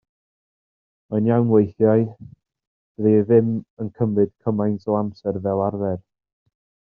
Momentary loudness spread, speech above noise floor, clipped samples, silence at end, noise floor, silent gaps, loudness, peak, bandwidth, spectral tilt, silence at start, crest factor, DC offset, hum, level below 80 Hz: 10 LU; over 70 dB; under 0.1%; 0.95 s; under -90 dBFS; 2.67-2.95 s, 3.70-3.77 s; -21 LUFS; -4 dBFS; 5 kHz; -11 dB/octave; 1.1 s; 18 dB; under 0.1%; none; -62 dBFS